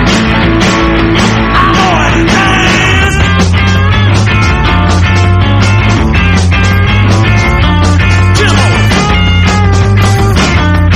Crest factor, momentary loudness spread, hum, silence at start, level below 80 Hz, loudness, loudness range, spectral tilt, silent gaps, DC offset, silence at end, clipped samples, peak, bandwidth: 6 dB; 1 LU; none; 0 s; -16 dBFS; -7 LUFS; 1 LU; -5.5 dB/octave; none; under 0.1%; 0 s; 2%; 0 dBFS; 11.5 kHz